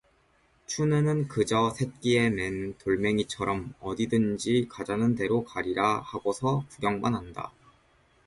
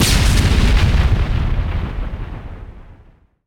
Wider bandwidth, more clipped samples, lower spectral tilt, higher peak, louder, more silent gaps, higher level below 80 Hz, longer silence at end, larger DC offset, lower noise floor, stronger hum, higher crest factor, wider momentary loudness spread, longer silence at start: second, 11.5 kHz vs 18 kHz; neither; first, -6 dB/octave vs -4.5 dB/octave; second, -10 dBFS vs -2 dBFS; second, -28 LUFS vs -17 LUFS; neither; second, -56 dBFS vs -18 dBFS; first, 0.8 s vs 0.55 s; neither; first, -65 dBFS vs -48 dBFS; neither; about the same, 18 dB vs 14 dB; second, 8 LU vs 18 LU; first, 0.7 s vs 0 s